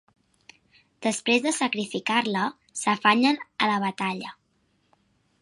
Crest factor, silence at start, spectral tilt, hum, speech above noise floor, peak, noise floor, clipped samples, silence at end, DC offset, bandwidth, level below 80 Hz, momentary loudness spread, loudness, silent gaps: 22 dB; 1 s; -3 dB/octave; none; 44 dB; -4 dBFS; -69 dBFS; under 0.1%; 1.1 s; under 0.1%; 11.5 kHz; -76 dBFS; 10 LU; -25 LUFS; none